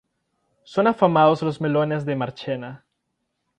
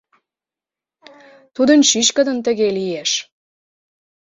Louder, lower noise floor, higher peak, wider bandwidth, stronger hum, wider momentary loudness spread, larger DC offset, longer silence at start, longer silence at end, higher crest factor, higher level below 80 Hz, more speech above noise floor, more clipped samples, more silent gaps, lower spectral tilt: second, -21 LUFS vs -16 LUFS; second, -76 dBFS vs -89 dBFS; about the same, -2 dBFS vs 0 dBFS; first, 9.4 kHz vs 7.8 kHz; neither; first, 13 LU vs 9 LU; neither; second, 0.7 s vs 1.6 s; second, 0.85 s vs 1.1 s; about the same, 22 dB vs 20 dB; about the same, -64 dBFS vs -64 dBFS; second, 55 dB vs 73 dB; neither; neither; first, -8 dB/octave vs -2 dB/octave